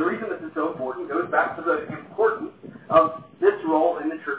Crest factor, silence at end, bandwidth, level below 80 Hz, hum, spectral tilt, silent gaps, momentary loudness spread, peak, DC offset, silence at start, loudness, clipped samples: 20 dB; 0 s; 4 kHz; -62 dBFS; none; -9.5 dB/octave; none; 11 LU; -4 dBFS; under 0.1%; 0 s; -24 LUFS; under 0.1%